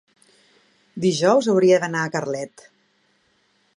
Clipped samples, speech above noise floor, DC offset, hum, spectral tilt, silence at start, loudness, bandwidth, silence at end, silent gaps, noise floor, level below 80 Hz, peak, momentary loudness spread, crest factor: under 0.1%; 45 dB; under 0.1%; none; -5 dB/octave; 0.95 s; -20 LUFS; 11 kHz; 1.3 s; none; -64 dBFS; -72 dBFS; -4 dBFS; 15 LU; 18 dB